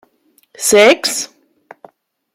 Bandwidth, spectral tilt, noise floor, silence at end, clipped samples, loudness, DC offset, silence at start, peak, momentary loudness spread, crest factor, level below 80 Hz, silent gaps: 16 kHz; -1.5 dB/octave; -57 dBFS; 1.1 s; under 0.1%; -12 LUFS; under 0.1%; 0.6 s; 0 dBFS; 14 LU; 16 dB; -60 dBFS; none